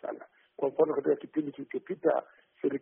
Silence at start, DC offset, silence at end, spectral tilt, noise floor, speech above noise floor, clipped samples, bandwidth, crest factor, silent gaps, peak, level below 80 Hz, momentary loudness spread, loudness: 0.05 s; under 0.1%; 0.05 s; -3 dB/octave; -48 dBFS; 17 dB; under 0.1%; 3.6 kHz; 18 dB; none; -14 dBFS; -80 dBFS; 13 LU; -31 LUFS